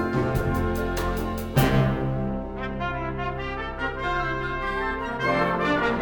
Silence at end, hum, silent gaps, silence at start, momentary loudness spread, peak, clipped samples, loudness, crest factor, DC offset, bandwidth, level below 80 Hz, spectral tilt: 0 s; none; none; 0 s; 7 LU; -6 dBFS; under 0.1%; -26 LUFS; 18 dB; under 0.1%; 19 kHz; -36 dBFS; -6.5 dB/octave